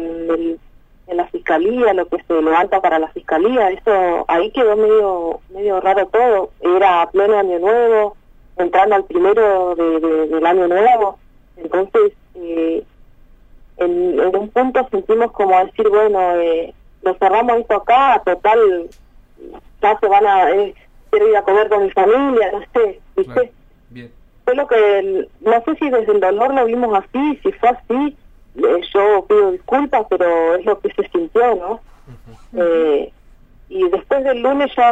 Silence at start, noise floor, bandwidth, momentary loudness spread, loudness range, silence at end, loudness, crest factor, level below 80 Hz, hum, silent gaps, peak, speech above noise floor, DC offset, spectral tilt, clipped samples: 0 s; -45 dBFS; 7.8 kHz; 9 LU; 4 LU; 0 s; -15 LUFS; 14 dB; -46 dBFS; none; none; -2 dBFS; 30 dB; under 0.1%; -6 dB/octave; under 0.1%